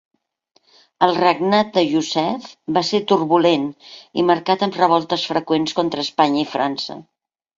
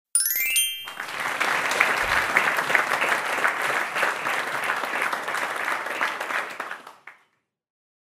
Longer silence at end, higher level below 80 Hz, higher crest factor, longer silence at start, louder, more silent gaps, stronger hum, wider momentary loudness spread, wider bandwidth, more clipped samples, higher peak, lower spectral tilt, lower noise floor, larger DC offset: second, 0.55 s vs 0.95 s; about the same, -62 dBFS vs -58 dBFS; second, 18 dB vs 24 dB; first, 1 s vs 0.15 s; first, -18 LUFS vs -23 LUFS; neither; neither; about the same, 8 LU vs 8 LU; second, 7.8 kHz vs 16 kHz; neither; about the same, -2 dBFS vs -2 dBFS; first, -5 dB/octave vs 0 dB/octave; second, -63 dBFS vs -68 dBFS; neither